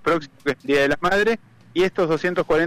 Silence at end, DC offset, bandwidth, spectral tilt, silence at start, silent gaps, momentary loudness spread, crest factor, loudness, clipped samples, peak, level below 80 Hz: 0 s; under 0.1%; 15.5 kHz; -5.5 dB/octave; 0.05 s; none; 8 LU; 10 dB; -21 LUFS; under 0.1%; -12 dBFS; -46 dBFS